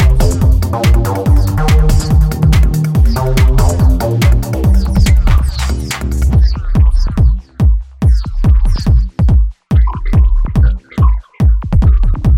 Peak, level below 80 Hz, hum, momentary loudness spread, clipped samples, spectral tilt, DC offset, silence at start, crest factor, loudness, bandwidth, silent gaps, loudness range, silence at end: 0 dBFS; -12 dBFS; none; 3 LU; under 0.1%; -7 dB/octave; under 0.1%; 0 s; 10 dB; -13 LUFS; 16 kHz; none; 2 LU; 0 s